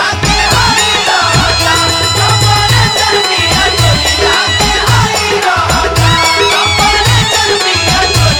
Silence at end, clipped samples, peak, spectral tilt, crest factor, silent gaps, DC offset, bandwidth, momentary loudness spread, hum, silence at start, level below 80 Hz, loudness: 0 s; under 0.1%; 0 dBFS; -3 dB/octave; 10 dB; none; 0.2%; over 20 kHz; 2 LU; none; 0 s; -24 dBFS; -8 LUFS